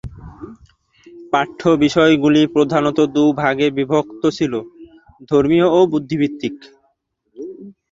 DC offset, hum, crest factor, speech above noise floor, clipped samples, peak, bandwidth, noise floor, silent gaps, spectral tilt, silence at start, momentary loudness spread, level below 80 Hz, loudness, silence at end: under 0.1%; none; 16 dB; 50 dB; under 0.1%; 0 dBFS; 7.8 kHz; -66 dBFS; none; -6.5 dB/octave; 0.05 s; 21 LU; -48 dBFS; -16 LUFS; 0.2 s